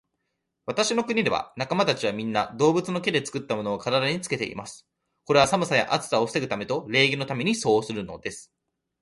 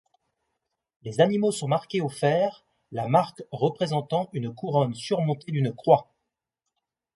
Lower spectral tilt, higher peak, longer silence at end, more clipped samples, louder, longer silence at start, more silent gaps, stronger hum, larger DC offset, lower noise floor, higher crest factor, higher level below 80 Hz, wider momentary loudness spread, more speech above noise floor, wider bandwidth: second, -4 dB/octave vs -6.5 dB/octave; about the same, -6 dBFS vs -4 dBFS; second, 0.6 s vs 1.1 s; neither; about the same, -24 LUFS vs -26 LUFS; second, 0.65 s vs 1.05 s; neither; neither; neither; second, -79 dBFS vs -84 dBFS; about the same, 20 dB vs 22 dB; first, -60 dBFS vs -68 dBFS; about the same, 12 LU vs 10 LU; second, 54 dB vs 59 dB; about the same, 11.5 kHz vs 11.5 kHz